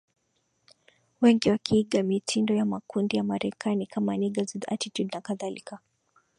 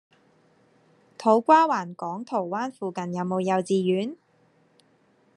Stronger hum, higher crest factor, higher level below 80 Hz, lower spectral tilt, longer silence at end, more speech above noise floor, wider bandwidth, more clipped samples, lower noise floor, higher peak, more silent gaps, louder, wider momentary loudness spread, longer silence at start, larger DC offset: neither; about the same, 20 dB vs 22 dB; first, -64 dBFS vs -78 dBFS; about the same, -5.5 dB/octave vs -6.5 dB/octave; second, 0.6 s vs 1.2 s; first, 47 dB vs 39 dB; about the same, 11 kHz vs 10.5 kHz; neither; first, -74 dBFS vs -63 dBFS; second, -8 dBFS vs -4 dBFS; neither; second, -27 LUFS vs -24 LUFS; second, 11 LU vs 14 LU; about the same, 1.2 s vs 1.2 s; neither